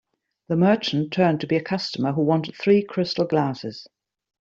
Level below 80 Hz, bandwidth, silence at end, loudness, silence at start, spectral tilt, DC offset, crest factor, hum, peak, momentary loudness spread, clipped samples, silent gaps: -64 dBFS; 7.6 kHz; 0.6 s; -22 LUFS; 0.5 s; -7 dB/octave; under 0.1%; 18 dB; none; -6 dBFS; 8 LU; under 0.1%; none